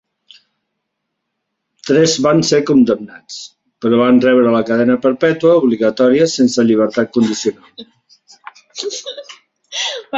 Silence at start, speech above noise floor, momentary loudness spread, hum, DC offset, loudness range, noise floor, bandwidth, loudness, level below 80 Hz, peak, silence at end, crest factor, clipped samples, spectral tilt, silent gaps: 1.85 s; 61 dB; 18 LU; none; under 0.1%; 5 LU; -74 dBFS; 7.8 kHz; -13 LUFS; -56 dBFS; -2 dBFS; 0 s; 14 dB; under 0.1%; -5 dB/octave; none